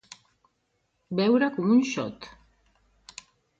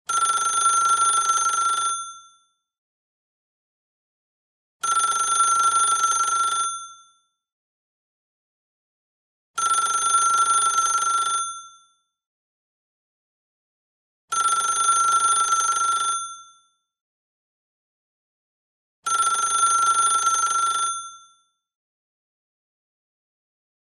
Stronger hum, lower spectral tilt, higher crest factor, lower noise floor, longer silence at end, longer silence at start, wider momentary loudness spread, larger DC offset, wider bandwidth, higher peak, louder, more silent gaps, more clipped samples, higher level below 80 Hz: neither; first, -6 dB/octave vs 3 dB/octave; about the same, 18 dB vs 16 dB; first, -74 dBFS vs -62 dBFS; second, 1.3 s vs 2.65 s; first, 1.1 s vs 0.1 s; first, 23 LU vs 10 LU; neither; second, 7.8 kHz vs 12 kHz; about the same, -10 dBFS vs -10 dBFS; second, -25 LUFS vs -20 LUFS; second, none vs 2.78-4.80 s, 7.52-9.54 s, 12.26-14.28 s, 17.01-19.03 s; neither; first, -66 dBFS vs -78 dBFS